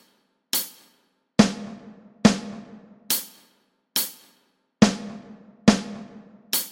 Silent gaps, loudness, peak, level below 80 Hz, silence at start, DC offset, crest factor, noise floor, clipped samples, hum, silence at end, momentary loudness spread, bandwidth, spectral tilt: none; -23 LUFS; -2 dBFS; -54 dBFS; 0.55 s; under 0.1%; 24 dB; -66 dBFS; under 0.1%; none; 0 s; 20 LU; 17 kHz; -4 dB/octave